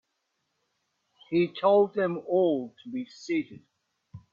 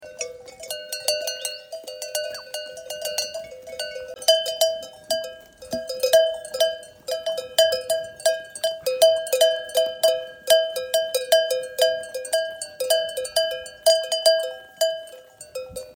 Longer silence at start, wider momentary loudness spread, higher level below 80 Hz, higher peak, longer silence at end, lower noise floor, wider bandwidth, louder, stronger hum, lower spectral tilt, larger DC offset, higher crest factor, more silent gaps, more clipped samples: first, 1.3 s vs 0 s; about the same, 15 LU vs 15 LU; second, -72 dBFS vs -64 dBFS; second, -10 dBFS vs -2 dBFS; about the same, 0.15 s vs 0.05 s; first, -79 dBFS vs -44 dBFS; second, 7.2 kHz vs 18 kHz; second, -27 LUFS vs -23 LUFS; neither; first, -7 dB/octave vs 0.5 dB/octave; neither; about the same, 20 dB vs 22 dB; neither; neither